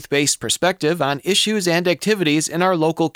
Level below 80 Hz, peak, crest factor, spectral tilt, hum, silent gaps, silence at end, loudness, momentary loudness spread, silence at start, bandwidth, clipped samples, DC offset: -60 dBFS; -4 dBFS; 14 dB; -3.5 dB/octave; none; none; 0.05 s; -18 LUFS; 2 LU; 0 s; 17 kHz; under 0.1%; under 0.1%